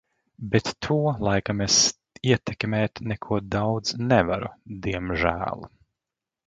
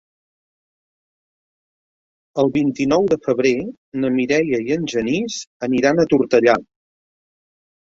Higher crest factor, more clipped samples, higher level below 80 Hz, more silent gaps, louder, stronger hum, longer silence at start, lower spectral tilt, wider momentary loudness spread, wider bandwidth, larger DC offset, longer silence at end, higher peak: about the same, 22 dB vs 18 dB; neither; first, -46 dBFS vs -56 dBFS; second, none vs 3.77-3.92 s, 5.47-5.60 s; second, -24 LUFS vs -18 LUFS; neither; second, 0.4 s vs 2.35 s; second, -4 dB/octave vs -5.5 dB/octave; first, 12 LU vs 9 LU; first, 11 kHz vs 7.8 kHz; neither; second, 0.8 s vs 1.25 s; about the same, -4 dBFS vs -2 dBFS